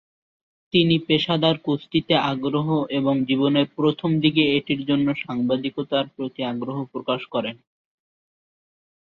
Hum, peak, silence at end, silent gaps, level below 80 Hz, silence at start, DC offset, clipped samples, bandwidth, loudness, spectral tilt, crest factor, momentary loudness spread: none; -4 dBFS; 1.5 s; none; -60 dBFS; 0.75 s; under 0.1%; under 0.1%; 6.4 kHz; -22 LUFS; -8 dB/octave; 20 dB; 9 LU